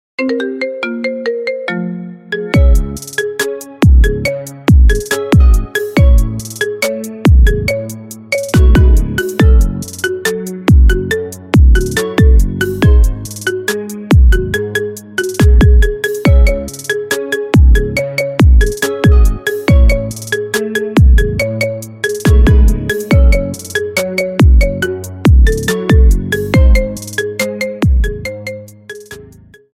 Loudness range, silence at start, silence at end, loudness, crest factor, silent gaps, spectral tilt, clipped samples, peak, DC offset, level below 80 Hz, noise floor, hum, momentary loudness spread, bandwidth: 2 LU; 0.2 s; 0.55 s; -13 LUFS; 10 dB; none; -6 dB/octave; under 0.1%; 0 dBFS; under 0.1%; -12 dBFS; -39 dBFS; none; 10 LU; 15 kHz